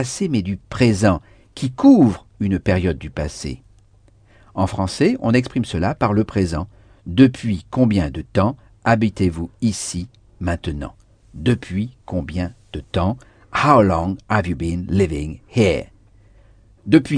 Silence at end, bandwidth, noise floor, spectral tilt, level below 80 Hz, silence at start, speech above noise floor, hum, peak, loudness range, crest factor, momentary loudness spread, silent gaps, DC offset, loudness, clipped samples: 0 s; 10 kHz; -52 dBFS; -6.5 dB/octave; -38 dBFS; 0 s; 34 dB; none; 0 dBFS; 6 LU; 20 dB; 14 LU; none; under 0.1%; -19 LUFS; under 0.1%